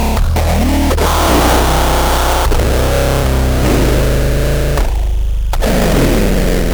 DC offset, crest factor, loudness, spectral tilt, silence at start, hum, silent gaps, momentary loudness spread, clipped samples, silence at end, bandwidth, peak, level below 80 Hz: under 0.1%; 10 dB; -13 LUFS; -5 dB/octave; 0 s; none; none; 5 LU; under 0.1%; 0 s; over 20 kHz; 0 dBFS; -14 dBFS